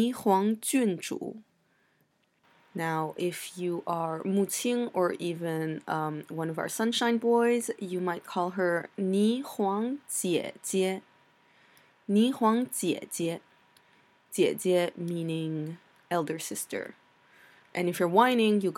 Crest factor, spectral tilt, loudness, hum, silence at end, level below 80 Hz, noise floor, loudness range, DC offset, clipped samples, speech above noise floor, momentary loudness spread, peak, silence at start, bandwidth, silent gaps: 22 dB; -4.5 dB/octave; -29 LUFS; none; 0 s; -82 dBFS; -71 dBFS; 4 LU; under 0.1%; under 0.1%; 42 dB; 10 LU; -8 dBFS; 0 s; 16.5 kHz; none